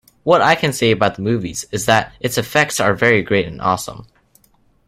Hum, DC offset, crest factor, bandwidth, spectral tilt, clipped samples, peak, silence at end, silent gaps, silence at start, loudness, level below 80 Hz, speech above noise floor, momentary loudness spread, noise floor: none; under 0.1%; 18 dB; 16.5 kHz; -4 dB/octave; under 0.1%; 0 dBFS; 0.85 s; none; 0.25 s; -16 LUFS; -48 dBFS; 40 dB; 8 LU; -56 dBFS